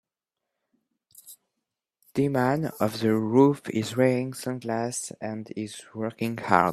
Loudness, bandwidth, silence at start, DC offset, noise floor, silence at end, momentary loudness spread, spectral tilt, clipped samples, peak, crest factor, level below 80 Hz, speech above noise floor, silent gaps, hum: -26 LUFS; 14 kHz; 1.25 s; under 0.1%; -86 dBFS; 0 s; 13 LU; -6 dB/octave; under 0.1%; -2 dBFS; 26 dB; -68 dBFS; 61 dB; none; none